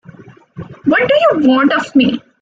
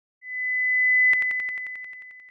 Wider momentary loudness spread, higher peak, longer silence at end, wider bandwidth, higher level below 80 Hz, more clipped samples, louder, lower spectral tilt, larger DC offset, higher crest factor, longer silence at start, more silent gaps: second, 13 LU vs 19 LU; first, 0 dBFS vs -14 dBFS; first, 0.25 s vs 0 s; first, 7.6 kHz vs 5.4 kHz; first, -54 dBFS vs -76 dBFS; neither; first, -12 LUFS vs -20 LUFS; first, -6 dB/octave vs -1 dB/octave; neither; about the same, 12 dB vs 10 dB; first, 0.55 s vs 0.25 s; neither